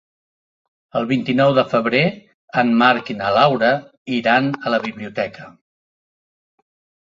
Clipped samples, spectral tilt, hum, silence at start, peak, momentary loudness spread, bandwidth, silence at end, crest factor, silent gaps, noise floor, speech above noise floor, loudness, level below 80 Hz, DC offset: under 0.1%; -7 dB/octave; none; 0.95 s; 0 dBFS; 11 LU; 7.4 kHz; 1.6 s; 20 dB; 2.34-2.48 s, 3.97-4.06 s; under -90 dBFS; over 73 dB; -18 LUFS; -60 dBFS; under 0.1%